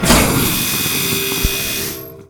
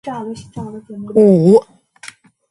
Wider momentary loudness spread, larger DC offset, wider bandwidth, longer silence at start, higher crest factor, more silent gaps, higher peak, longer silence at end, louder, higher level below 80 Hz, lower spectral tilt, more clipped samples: second, 8 LU vs 20 LU; neither; first, 19.5 kHz vs 11.5 kHz; about the same, 0 s vs 0.05 s; about the same, 16 dB vs 16 dB; neither; about the same, 0 dBFS vs 0 dBFS; second, 0.05 s vs 0.45 s; second, -15 LUFS vs -12 LUFS; first, -28 dBFS vs -56 dBFS; second, -3 dB/octave vs -8.5 dB/octave; neither